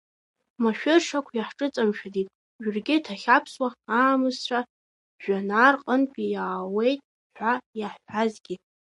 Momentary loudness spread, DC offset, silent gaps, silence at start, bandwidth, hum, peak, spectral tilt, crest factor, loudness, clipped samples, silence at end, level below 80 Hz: 12 LU; under 0.1%; 2.35-2.59 s, 4.70-5.19 s, 7.04-7.30 s, 7.66-7.73 s; 0.6 s; 11.5 kHz; none; -4 dBFS; -4.5 dB/octave; 20 dB; -25 LUFS; under 0.1%; 0.25 s; -78 dBFS